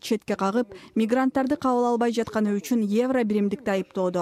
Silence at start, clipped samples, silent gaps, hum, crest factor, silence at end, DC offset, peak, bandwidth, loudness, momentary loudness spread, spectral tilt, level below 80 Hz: 0.05 s; under 0.1%; none; none; 14 dB; 0 s; under 0.1%; -10 dBFS; 15.5 kHz; -24 LUFS; 5 LU; -6 dB/octave; -62 dBFS